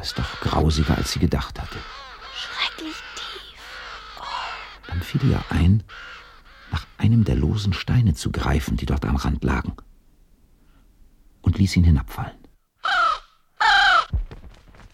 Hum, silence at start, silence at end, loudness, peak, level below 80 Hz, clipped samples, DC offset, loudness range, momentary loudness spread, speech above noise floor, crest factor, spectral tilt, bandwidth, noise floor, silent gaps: none; 0 s; 0.05 s; -22 LUFS; -6 dBFS; -32 dBFS; under 0.1%; under 0.1%; 8 LU; 17 LU; 33 dB; 18 dB; -5.5 dB/octave; 15 kHz; -54 dBFS; none